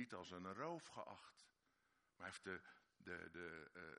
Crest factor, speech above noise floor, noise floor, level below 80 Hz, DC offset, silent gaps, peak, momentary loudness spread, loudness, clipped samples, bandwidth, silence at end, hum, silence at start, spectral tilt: 22 dB; 30 dB; -84 dBFS; -86 dBFS; under 0.1%; none; -34 dBFS; 12 LU; -54 LUFS; under 0.1%; 10.5 kHz; 0 s; none; 0 s; -4.5 dB/octave